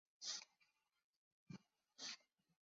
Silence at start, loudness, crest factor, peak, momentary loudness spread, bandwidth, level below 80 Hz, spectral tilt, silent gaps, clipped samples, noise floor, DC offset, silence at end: 0.2 s; -53 LUFS; 24 dB; -34 dBFS; 13 LU; 7.6 kHz; under -90 dBFS; -1 dB/octave; 1.04-1.46 s; under 0.1%; -84 dBFS; under 0.1%; 0.45 s